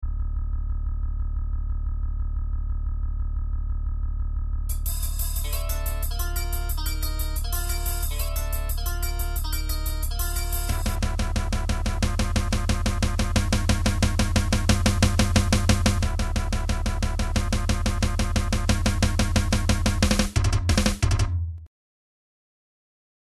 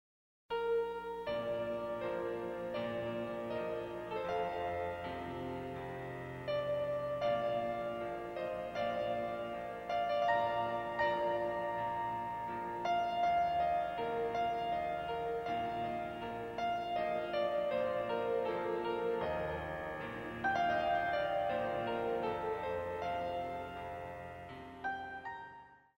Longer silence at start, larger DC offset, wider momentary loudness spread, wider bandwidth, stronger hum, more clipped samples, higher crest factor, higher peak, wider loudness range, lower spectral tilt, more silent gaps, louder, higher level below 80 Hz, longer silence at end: second, 0 s vs 0.5 s; neither; about the same, 9 LU vs 9 LU; about the same, 15.5 kHz vs 16 kHz; neither; neither; about the same, 18 dB vs 16 dB; first, -6 dBFS vs -20 dBFS; first, 8 LU vs 4 LU; second, -4.5 dB/octave vs -6 dB/octave; neither; first, -26 LUFS vs -37 LUFS; first, -26 dBFS vs -62 dBFS; first, 1.65 s vs 0.25 s